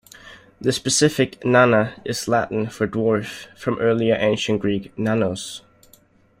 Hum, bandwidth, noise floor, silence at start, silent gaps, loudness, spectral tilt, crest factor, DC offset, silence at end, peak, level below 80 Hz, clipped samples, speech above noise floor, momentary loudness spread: none; 16 kHz; -55 dBFS; 0.25 s; none; -20 LUFS; -4.5 dB/octave; 18 dB; under 0.1%; 0.8 s; -2 dBFS; -56 dBFS; under 0.1%; 35 dB; 10 LU